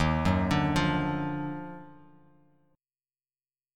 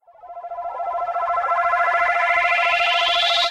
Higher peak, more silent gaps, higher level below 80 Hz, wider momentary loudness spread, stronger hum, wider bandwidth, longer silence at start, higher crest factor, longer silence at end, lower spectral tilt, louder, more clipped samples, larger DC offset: second, -10 dBFS vs -6 dBFS; neither; first, -44 dBFS vs -58 dBFS; about the same, 15 LU vs 13 LU; neither; about the same, 13 kHz vs 12.5 kHz; second, 0 s vs 0.25 s; first, 20 dB vs 14 dB; first, 1.8 s vs 0 s; first, -6.5 dB/octave vs 0.5 dB/octave; second, -28 LUFS vs -18 LUFS; neither; neither